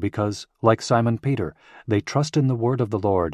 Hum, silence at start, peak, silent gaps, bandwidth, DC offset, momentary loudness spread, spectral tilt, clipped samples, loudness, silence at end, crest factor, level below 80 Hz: none; 0 s; -2 dBFS; none; 11.5 kHz; under 0.1%; 7 LU; -7 dB/octave; under 0.1%; -23 LUFS; 0 s; 20 dB; -46 dBFS